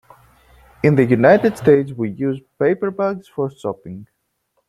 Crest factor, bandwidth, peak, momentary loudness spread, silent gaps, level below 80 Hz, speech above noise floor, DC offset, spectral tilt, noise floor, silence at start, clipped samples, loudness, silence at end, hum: 18 dB; 12.5 kHz; -2 dBFS; 15 LU; none; -54 dBFS; 52 dB; under 0.1%; -8.5 dB/octave; -69 dBFS; 0.85 s; under 0.1%; -17 LUFS; 0.65 s; none